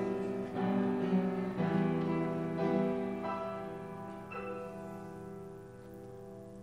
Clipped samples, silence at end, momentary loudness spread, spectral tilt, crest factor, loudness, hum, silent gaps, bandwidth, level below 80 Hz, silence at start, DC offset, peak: under 0.1%; 0 s; 17 LU; -8.5 dB/octave; 18 dB; -35 LUFS; none; none; 10.5 kHz; -68 dBFS; 0 s; under 0.1%; -18 dBFS